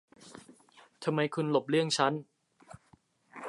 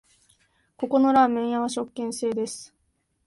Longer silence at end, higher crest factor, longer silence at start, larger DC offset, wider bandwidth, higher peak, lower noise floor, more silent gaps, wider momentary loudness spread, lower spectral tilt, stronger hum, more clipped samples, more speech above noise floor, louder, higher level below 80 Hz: second, 0 s vs 0.6 s; about the same, 22 dB vs 18 dB; second, 0.2 s vs 0.8 s; neither; about the same, 11.5 kHz vs 11.5 kHz; second, -12 dBFS vs -8 dBFS; second, -66 dBFS vs -72 dBFS; neither; first, 24 LU vs 14 LU; about the same, -5 dB/octave vs -4 dB/octave; neither; neither; second, 36 dB vs 48 dB; second, -30 LUFS vs -24 LUFS; second, -76 dBFS vs -68 dBFS